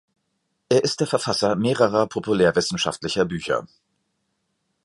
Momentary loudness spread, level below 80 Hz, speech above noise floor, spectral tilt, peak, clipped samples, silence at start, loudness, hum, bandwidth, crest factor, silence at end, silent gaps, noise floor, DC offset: 5 LU; -56 dBFS; 53 dB; -4.5 dB/octave; -4 dBFS; under 0.1%; 0.7 s; -22 LUFS; none; 11.5 kHz; 20 dB; 1.2 s; none; -74 dBFS; under 0.1%